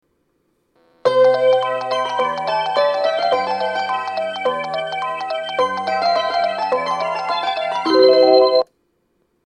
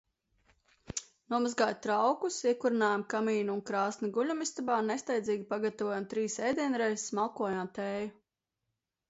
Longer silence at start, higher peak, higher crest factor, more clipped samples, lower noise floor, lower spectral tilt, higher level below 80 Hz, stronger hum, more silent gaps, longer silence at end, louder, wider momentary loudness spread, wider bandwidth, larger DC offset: first, 1.05 s vs 0.9 s; first, 0 dBFS vs -16 dBFS; about the same, 18 dB vs 18 dB; neither; second, -66 dBFS vs -87 dBFS; about the same, -4 dB/octave vs -4 dB/octave; about the same, -68 dBFS vs -70 dBFS; neither; neither; second, 0.8 s vs 1 s; first, -18 LUFS vs -32 LUFS; first, 10 LU vs 7 LU; first, 9.8 kHz vs 8.2 kHz; neither